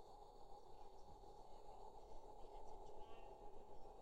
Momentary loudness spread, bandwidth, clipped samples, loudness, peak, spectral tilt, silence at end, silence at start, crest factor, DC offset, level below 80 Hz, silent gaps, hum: 3 LU; 9 kHz; under 0.1%; -62 LUFS; -42 dBFS; -5.5 dB/octave; 0 s; 0 s; 14 dB; under 0.1%; -64 dBFS; none; none